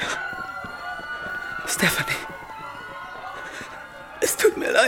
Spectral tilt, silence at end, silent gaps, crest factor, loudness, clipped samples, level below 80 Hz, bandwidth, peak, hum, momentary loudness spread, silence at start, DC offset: -2.5 dB/octave; 0 s; none; 22 dB; -26 LUFS; under 0.1%; -54 dBFS; 17 kHz; -4 dBFS; none; 16 LU; 0 s; under 0.1%